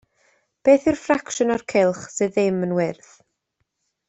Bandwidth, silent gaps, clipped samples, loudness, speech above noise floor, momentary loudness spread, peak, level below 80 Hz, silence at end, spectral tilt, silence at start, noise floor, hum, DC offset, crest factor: 8.2 kHz; none; under 0.1%; -21 LUFS; 55 dB; 7 LU; -4 dBFS; -58 dBFS; 1.15 s; -5.5 dB/octave; 0.65 s; -75 dBFS; none; under 0.1%; 18 dB